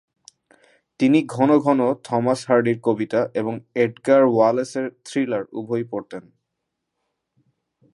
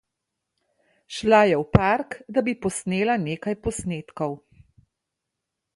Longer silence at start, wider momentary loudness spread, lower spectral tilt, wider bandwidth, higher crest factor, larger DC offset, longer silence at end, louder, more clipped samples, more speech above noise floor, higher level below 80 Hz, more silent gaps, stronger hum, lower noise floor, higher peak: about the same, 1 s vs 1.1 s; about the same, 11 LU vs 13 LU; about the same, -6.5 dB/octave vs -5.5 dB/octave; about the same, 11.5 kHz vs 11.5 kHz; second, 18 dB vs 24 dB; neither; first, 1.75 s vs 1.4 s; first, -20 LUFS vs -23 LUFS; neither; about the same, 60 dB vs 60 dB; second, -70 dBFS vs -46 dBFS; neither; neither; second, -79 dBFS vs -83 dBFS; second, -4 dBFS vs 0 dBFS